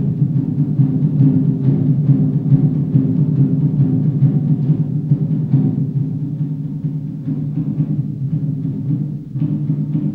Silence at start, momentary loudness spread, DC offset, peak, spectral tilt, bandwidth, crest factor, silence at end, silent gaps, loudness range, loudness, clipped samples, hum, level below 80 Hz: 0 s; 8 LU; under 0.1%; -2 dBFS; -13 dB/octave; 1.9 kHz; 14 dB; 0 s; none; 6 LU; -17 LUFS; under 0.1%; none; -48 dBFS